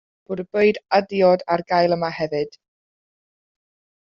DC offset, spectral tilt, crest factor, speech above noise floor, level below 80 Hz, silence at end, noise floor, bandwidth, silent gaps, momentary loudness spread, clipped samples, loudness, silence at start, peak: under 0.1%; -4 dB/octave; 18 dB; over 70 dB; -64 dBFS; 1.55 s; under -90 dBFS; 7 kHz; none; 12 LU; under 0.1%; -20 LUFS; 0.3 s; -4 dBFS